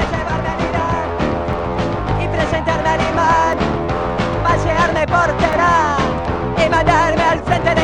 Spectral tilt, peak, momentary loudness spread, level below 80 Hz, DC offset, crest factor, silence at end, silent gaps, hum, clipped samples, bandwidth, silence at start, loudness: -6 dB/octave; 0 dBFS; 6 LU; -28 dBFS; 0.9%; 16 dB; 0 s; none; none; under 0.1%; 10 kHz; 0 s; -16 LUFS